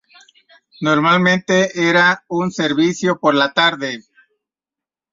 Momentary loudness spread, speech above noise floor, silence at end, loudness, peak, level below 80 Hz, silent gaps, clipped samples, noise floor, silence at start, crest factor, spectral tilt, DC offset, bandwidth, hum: 10 LU; 73 dB; 1.1 s; -15 LUFS; -2 dBFS; -62 dBFS; none; under 0.1%; -88 dBFS; 0.8 s; 16 dB; -4.5 dB/octave; under 0.1%; 7.6 kHz; none